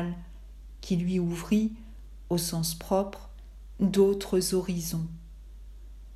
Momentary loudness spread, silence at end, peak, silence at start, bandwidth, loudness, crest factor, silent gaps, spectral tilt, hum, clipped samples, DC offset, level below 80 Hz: 25 LU; 0 s; -12 dBFS; 0 s; 14.5 kHz; -28 LUFS; 18 dB; none; -5.5 dB/octave; none; under 0.1%; under 0.1%; -46 dBFS